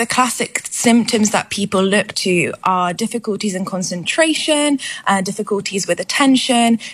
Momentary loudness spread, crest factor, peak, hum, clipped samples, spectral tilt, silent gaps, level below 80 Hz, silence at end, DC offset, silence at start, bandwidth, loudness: 7 LU; 16 dB; 0 dBFS; none; under 0.1%; -3.5 dB/octave; none; -60 dBFS; 0 s; under 0.1%; 0 s; 14.5 kHz; -16 LUFS